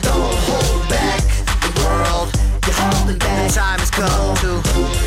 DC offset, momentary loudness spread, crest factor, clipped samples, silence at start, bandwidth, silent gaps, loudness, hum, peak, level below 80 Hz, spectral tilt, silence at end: under 0.1%; 2 LU; 10 dB; under 0.1%; 0 s; 16 kHz; none; -17 LUFS; none; -6 dBFS; -18 dBFS; -4 dB/octave; 0 s